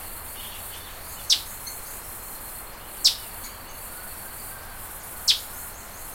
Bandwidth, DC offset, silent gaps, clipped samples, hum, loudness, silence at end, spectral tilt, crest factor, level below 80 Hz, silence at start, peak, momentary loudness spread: 16.5 kHz; under 0.1%; none; under 0.1%; none; -28 LUFS; 0 s; 0 dB/octave; 28 dB; -48 dBFS; 0 s; -4 dBFS; 16 LU